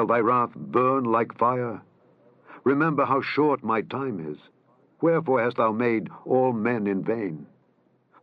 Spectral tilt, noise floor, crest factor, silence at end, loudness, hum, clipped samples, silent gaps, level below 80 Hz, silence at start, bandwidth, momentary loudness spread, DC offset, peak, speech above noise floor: -9.5 dB/octave; -65 dBFS; 18 dB; 0.75 s; -24 LUFS; none; under 0.1%; none; -78 dBFS; 0 s; 5.8 kHz; 10 LU; under 0.1%; -8 dBFS; 41 dB